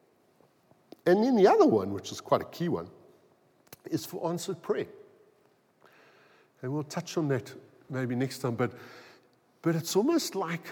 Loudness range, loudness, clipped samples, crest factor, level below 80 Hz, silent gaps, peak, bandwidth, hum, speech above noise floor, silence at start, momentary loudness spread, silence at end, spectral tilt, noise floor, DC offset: 10 LU; -29 LUFS; under 0.1%; 20 dB; -80 dBFS; none; -10 dBFS; 19 kHz; none; 38 dB; 1.05 s; 17 LU; 0 s; -6 dB/octave; -66 dBFS; under 0.1%